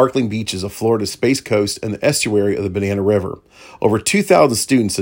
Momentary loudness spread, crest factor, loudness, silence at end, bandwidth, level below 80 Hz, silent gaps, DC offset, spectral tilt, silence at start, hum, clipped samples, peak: 8 LU; 16 dB; -17 LUFS; 0 s; 17 kHz; -52 dBFS; none; under 0.1%; -4.5 dB/octave; 0 s; none; under 0.1%; 0 dBFS